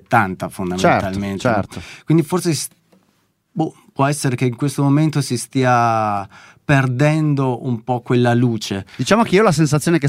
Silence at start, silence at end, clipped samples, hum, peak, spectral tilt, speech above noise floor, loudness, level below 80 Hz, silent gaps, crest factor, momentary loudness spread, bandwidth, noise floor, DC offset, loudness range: 0.1 s; 0 s; under 0.1%; none; -2 dBFS; -6 dB/octave; 46 dB; -17 LUFS; -50 dBFS; none; 16 dB; 10 LU; 16 kHz; -63 dBFS; under 0.1%; 4 LU